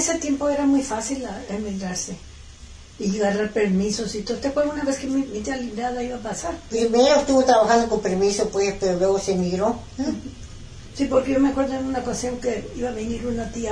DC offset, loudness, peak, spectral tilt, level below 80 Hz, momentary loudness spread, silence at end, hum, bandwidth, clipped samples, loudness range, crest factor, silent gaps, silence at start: under 0.1%; -23 LUFS; -4 dBFS; -4.5 dB/octave; -42 dBFS; 12 LU; 0 s; none; 11 kHz; under 0.1%; 6 LU; 18 dB; none; 0 s